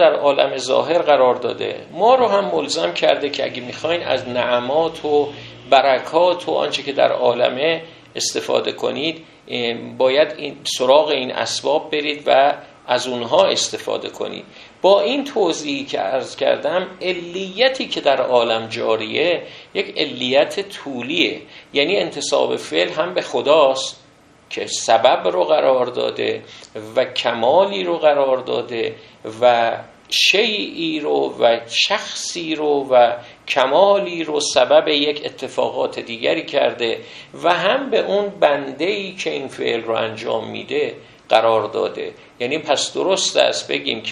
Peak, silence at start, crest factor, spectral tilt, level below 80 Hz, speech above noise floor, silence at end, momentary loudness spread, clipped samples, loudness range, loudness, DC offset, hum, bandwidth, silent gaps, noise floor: 0 dBFS; 0 s; 18 dB; -3 dB/octave; -64 dBFS; 31 dB; 0 s; 11 LU; under 0.1%; 3 LU; -18 LUFS; under 0.1%; none; 13 kHz; none; -50 dBFS